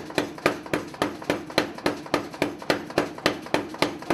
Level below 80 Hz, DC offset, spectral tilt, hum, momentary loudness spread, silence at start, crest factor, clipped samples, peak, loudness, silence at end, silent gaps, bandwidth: -56 dBFS; under 0.1%; -4 dB/octave; none; 5 LU; 0 s; 26 dB; under 0.1%; -2 dBFS; -27 LUFS; 0 s; none; 16 kHz